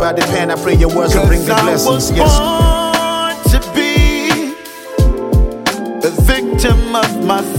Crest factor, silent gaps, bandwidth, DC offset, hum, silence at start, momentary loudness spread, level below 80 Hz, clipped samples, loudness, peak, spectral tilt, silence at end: 12 dB; none; 17 kHz; under 0.1%; none; 0 s; 6 LU; -16 dBFS; under 0.1%; -13 LUFS; 0 dBFS; -5 dB/octave; 0 s